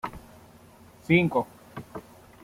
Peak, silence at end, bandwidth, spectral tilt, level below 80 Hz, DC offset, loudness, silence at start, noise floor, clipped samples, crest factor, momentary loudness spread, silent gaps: -8 dBFS; 0.45 s; 15.5 kHz; -7.5 dB/octave; -56 dBFS; under 0.1%; -25 LUFS; 0.05 s; -52 dBFS; under 0.1%; 22 dB; 23 LU; none